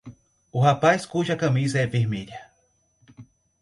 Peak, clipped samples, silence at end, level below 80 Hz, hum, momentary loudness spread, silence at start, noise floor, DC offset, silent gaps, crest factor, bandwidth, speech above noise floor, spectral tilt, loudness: -6 dBFS; under 0.1%; 0.4 s; -58 dBFS; none; 14 LU; 0.05 s; -67 dBFS; under 0.1%; none; 20 dB; 11 kHz; 45 dB; -6 dB/octave; -23 LUFS